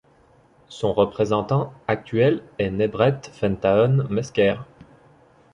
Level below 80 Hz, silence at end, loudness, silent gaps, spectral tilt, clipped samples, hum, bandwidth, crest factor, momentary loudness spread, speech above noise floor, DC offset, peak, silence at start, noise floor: -50 dBFS; 0.9 s; -22 LUFS; none; -7.5 dB/octave; under 0.1%; none; 10 kHz; 20 dB; 8 LU; 35 dB; under 0.1%; -4 dBFS; 0.7 s; -56 dBFS